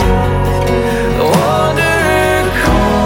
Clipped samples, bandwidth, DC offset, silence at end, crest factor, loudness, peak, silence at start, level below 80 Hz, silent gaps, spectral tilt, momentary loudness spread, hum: under 0.1%; 17.5 kHz; under 0.1%; 0 s; 10 dB; -12 LUFS; 0 dBFS; 0 s; -20 dBFS; none; -5.5 dB/octave; 3 LU; none